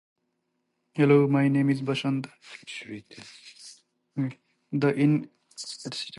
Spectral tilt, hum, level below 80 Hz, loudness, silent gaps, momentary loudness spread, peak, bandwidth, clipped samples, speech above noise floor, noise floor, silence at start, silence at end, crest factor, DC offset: -6.5 dB/octave; none; -74 dBFS; -25 LUFS; none; 24 LU; -8 dBFS; 11.5 kHz; under 0.1%; 52 dB; -77 dBFS; 0.95 s; 0 s; 20 dB; under 0.1%